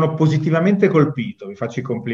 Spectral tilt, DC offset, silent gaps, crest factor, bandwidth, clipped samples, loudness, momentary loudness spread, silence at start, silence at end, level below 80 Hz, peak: -8.5 dB/octave; under 0.1%; none; 16 dB; 7.4 kHz; under 0.1%; -18 LUFS; 12 LU; 0 s; 0 s; -62 dBFS; -2 dBFS